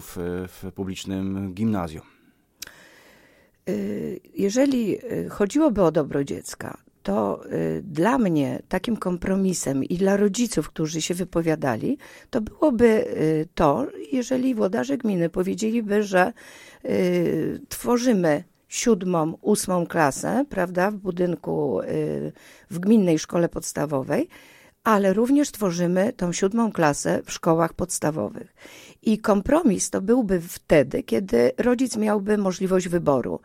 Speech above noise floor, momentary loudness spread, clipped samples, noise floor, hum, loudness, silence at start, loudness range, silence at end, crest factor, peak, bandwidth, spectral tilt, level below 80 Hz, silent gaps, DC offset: 34 dB; 11 LU; under 0.1%; -57 dBFS; none; -23 LUFS; 0 s; 3 LU; 0.1 s; 18 dB; -4 dBFS; 16.5 kHz; -5.5 dB/octave; -50 dBFS; none; under 0.1%